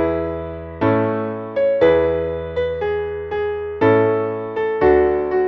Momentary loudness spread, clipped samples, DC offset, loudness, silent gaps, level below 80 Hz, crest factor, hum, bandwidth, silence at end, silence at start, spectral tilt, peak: 9 LU; under 0.1%; under 0.1%; -19 LUFS; none; -40 dBFS; 14 dB; none; 5.8 kHz; 0 s; 0 s; -9.5 dB/octave; -4 dBFS